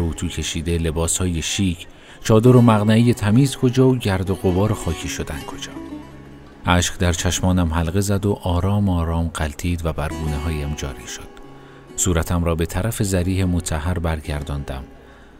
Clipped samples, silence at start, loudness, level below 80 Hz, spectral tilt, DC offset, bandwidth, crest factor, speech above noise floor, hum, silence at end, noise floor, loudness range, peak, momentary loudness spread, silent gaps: under 0.1%; 0 s; -20 LUFS; -32 dBFS; -5.5 dB/octave; under 0.1%; 16 kHz; 20 dB; 21 dB; none; 0.25 s; -41 dBFS; 7 LU; 0 dBFS; 16 LU; none